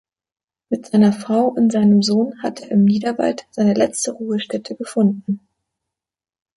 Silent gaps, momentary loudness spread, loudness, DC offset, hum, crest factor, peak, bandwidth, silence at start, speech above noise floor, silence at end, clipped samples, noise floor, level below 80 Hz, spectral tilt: none; 12 LU; -18 LUFS; under 0.1%; none; 16 dB; -2 dBFS; 11.5 kHz; 0.7 s; 66 dB; 1.2 s; under 0.1%; -83 dBFS; -62 dBFS; -6 dB/octave